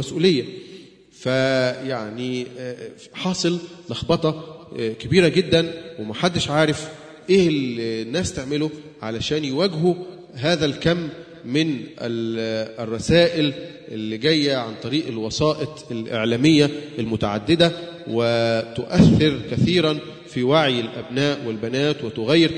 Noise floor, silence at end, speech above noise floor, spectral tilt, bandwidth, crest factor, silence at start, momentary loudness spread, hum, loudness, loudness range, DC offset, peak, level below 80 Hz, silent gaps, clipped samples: -44 dBFS; 0 s; 24 dB; -5.5 dB/octave; 10.5 kHz; 20 dB; 0 s; 14 LU; none; -21 LUFS; 5 LU; under 0.1%; 0 dBFS; -48 dBFS; none; under 0.1%